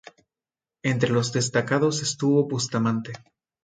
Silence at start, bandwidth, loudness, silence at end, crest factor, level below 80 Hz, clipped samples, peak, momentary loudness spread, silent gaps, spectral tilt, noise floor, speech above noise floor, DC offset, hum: 0.85 s; 9.6 kHz; -24 LUFS; 0.45 s; 18 dB; -64 dBFS; under 0.1%; -6 dBFS; 8 LU; none; -5 dB/octave; under -90 dBFS; over 67 dB; under 0.1%; none